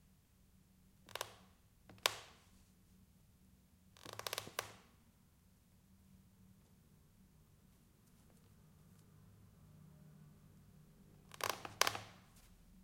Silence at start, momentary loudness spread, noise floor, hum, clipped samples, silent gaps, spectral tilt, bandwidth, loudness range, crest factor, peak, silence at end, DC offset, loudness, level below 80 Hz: 1.05 s; 28 LU; -70 dBFS; none; under 0.1%; none; -1 dB/octave; 16.5 kHz; 23 LU; 44 dB; -8 dBFS; 0 s; under 0.1%; -42 LUFS; -74 dBFS